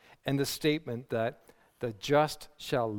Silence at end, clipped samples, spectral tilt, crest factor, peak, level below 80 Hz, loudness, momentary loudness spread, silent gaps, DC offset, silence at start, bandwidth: 0 s; under 0.1%; -5 dB/octave; 20 dB; -12 dBFS; -62 dBFS; -32 LUFS; 11 LU; none; under 0.1%; 0.25 s; 18 kHz